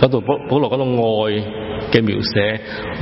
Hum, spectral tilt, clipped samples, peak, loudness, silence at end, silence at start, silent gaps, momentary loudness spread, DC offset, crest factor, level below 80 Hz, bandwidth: none; -9 dB/octave; under 0.1%; 0 dBFS; -18 LUFS; 0 s; 0 s; none; 9 LU; under 0.1%; 18 dB; -42 dBFS; 5.8 kHz